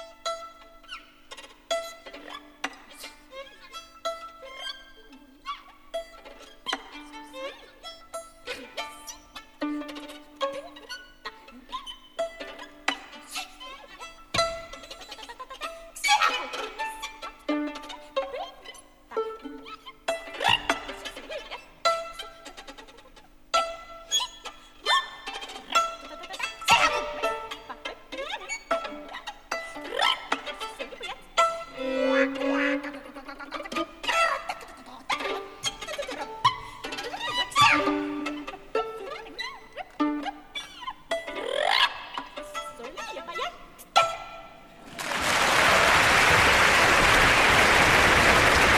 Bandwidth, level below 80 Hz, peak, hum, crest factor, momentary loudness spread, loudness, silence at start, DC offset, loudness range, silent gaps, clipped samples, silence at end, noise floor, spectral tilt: over 20 kHz; -48 dBFS; -6 dBFS; none; 22 dB; 24 LU; -25 LUFS; 0 s; under 0.1%; 16 LU; none; under 0.1%; 0 s; -52 dBFS; -2.5 dB/octave